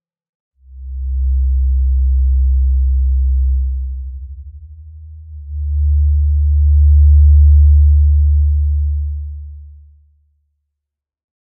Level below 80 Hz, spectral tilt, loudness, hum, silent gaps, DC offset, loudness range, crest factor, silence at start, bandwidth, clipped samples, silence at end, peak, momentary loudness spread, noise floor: -14 dBFS; -28 dB/octave; -14 LUFS; none; none; under 0.1%; 8 LU; 10 dB; 0.7 s; 0.2 kHz; under 0.1%; 1.8 s; -2 dBFS; 20 LU; -81 dBFS